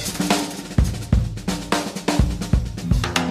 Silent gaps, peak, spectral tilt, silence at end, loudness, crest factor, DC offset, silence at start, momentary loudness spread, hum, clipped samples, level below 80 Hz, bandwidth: none; -6 dBFS; -5 dB/octave; 0 s; -22 LUFS; 16 dB; under 0.1%; 0 s; 3 LU; none; under 0.1%; -26 dBFS; 15.5 kHz